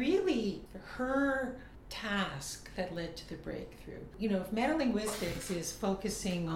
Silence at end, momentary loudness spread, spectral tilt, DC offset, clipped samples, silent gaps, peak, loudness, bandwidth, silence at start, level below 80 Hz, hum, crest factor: 0 s; 14 LU; -4.5 dB/octave; under 0.1%; under 0.1%; none; -20 dBFS; -35 LUFS; 17 kHz; 0 s; -54 dBFS; none; 16 dB